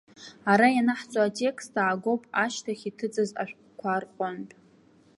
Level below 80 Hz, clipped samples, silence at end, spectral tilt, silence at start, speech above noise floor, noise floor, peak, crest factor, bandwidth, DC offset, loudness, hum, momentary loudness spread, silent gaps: -76 dBFS; under 0.1%; 0.7 s; -5 dB/octave; 0.2 s; 32 dB; -59 dBFS; -6 dBFS; 22 dB; 11.5 kHz; under 0.1%; -27 LUFS; none; 14 LU; none